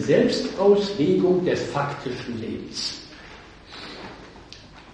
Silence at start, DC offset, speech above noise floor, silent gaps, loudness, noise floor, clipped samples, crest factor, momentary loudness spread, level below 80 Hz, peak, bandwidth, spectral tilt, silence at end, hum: 0 s; under 0.1%; 23 dB; none; -23 LUFS; -45 dBFS; under 0.1%; 18 dB; 24 LU; -52 dBFS; -6 dBFS; 10.5 kHz; -5.5 dB/octave; 0 s; none